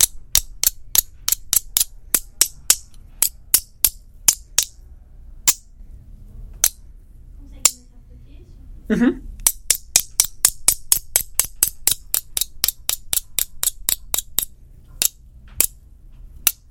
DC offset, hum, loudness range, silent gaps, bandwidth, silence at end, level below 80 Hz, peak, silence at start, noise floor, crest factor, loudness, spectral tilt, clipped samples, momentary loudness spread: under 0.1%; none; 5 LU; none; over 20 kHz; 0.2 s; -40 dBFS; 0 dBFS; 0 s; -43 dBFS; 22 dB; -19 LUFS; -0.5 dB/octave; under 0.1%; 6 LU